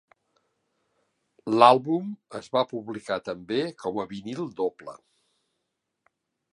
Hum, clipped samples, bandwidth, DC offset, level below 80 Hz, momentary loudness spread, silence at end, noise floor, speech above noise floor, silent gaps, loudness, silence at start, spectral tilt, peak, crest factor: none; under 0.1%; 11.5 kHz; under 0.1%; -72 dBFS; 20 LU; 1.6 s; -81 dBFS; 55 dB; none; -26 LUFS; 1.45 s; -6 dB/octave; -2 dBFS; 26 dB